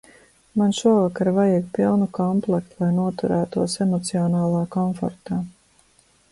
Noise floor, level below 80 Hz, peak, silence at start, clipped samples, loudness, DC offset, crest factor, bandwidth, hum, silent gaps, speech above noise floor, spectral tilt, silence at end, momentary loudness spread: -59 dBFS; -56 dBFS; -6 dBFS; 0.55 s; under 0.1%; -22 LUFS; under 0.1%; 16 dB; 11.5 kHz; none; none; 38 dB; -7 dB/octave; 0.8 s; 9 LU